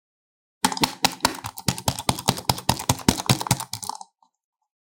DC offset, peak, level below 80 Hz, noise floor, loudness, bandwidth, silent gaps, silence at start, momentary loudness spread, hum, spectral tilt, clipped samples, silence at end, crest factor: under 0.1%; 0 dBFS; -48 dBFS; -48 dBFS; -24 LUFS; 17 kHz; none; 0.65 s; 7 LU; none; -3 dB/octave; under 0.1%; 0.75 s; 26 dB